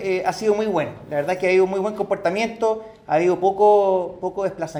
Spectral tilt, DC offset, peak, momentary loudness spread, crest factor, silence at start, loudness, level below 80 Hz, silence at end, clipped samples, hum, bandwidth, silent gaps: -6 dB/octave; under 0.1%; -4 dBFS; 10 LU; 16 dB; 0 s; -21 LUFS; -58 dBFS; 0 s; under 0.1%; none; 12 kHz; none